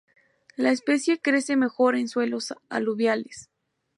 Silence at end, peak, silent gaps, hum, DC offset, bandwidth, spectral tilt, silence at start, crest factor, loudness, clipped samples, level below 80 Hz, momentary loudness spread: 0.55 s; -8 dBFS; none; none; under 0.1%; 11.5 kHz; -4 dB/octave; 0.6 s; 16 dB; -24 LUFS; under 0.1%; -78 dBFS; 10 LU